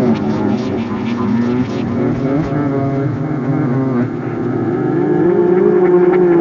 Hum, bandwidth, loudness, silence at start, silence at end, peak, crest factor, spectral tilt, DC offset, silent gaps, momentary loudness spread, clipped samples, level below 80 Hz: none; 6.8 kHz; -15 LUFS; 0 s; 0 s; 0 dBFS; 14 dB; -9.5 dB/octave; under 0.1%; none; 8 LU; under 0.1%; -44 dBFS